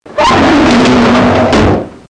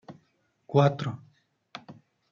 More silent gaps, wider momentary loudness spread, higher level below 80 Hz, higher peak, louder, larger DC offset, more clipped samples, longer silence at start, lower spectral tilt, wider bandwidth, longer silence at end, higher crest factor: neither; second, 3 LU vs 23 LU; first, -26 dBFS vs -72 dBFS; first, -2 dBFS vs -8 dBFS; first, -8 LUFS vs -26 LUFS; neither; neither; about the same, 0.1 s vs 0.1 s; second, -5.5 dB/octave vs -8 dB/octave; first, 10.5 kHz vs 7 kHz; second, 0.15 s vs 0.4 s; second, 6 dB vs 22 dB